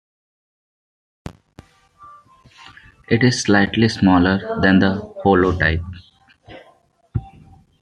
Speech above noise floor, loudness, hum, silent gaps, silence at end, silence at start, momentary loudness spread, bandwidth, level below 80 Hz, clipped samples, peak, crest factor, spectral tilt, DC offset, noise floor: 39 dB; -17 LUFS; none; none; 0.55 s; 1.25 s; 21 LU; 10 kHz; -44 dBFS; under 0.1%; 0 dBFS; 20 dB; -6 dB/octave; under 0.1%; -55 dBFS